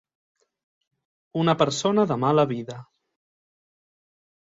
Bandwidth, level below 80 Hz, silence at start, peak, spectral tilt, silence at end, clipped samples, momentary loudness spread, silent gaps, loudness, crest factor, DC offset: 7.8 kHz; -66 dBFS; 1.35 s; -6 dBFS; -5.5 dB/octave; 1.6 s; under 0.1%; 14 LU; none; -22 LUFS; 22 dB; under 0.1%